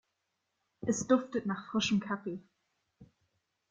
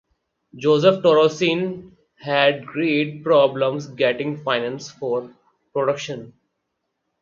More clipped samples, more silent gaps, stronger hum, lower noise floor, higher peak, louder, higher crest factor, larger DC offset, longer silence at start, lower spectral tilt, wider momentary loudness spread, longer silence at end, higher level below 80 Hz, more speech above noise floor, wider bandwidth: neither; neither; neither; first, -83 dBFS vs -76 dBFS; second, -14 dBFS vs -2 dBFS; second, -33 LUFS vs -20 LUFS; about the same, 22 dB vs 20 dB; neither; first, 0.8 s vs 0.55 s; about the same, -4.5 dB/octave vs -5.5 dB/octave; about the same, 11 LU vs 13 LU; second, 0.65 s vs 0.9 s; about the same, -70 dBFS vs -66 dBFS; second, 51 dB vs 57 dB; first, 9.4 kHz vs 7.4 kHz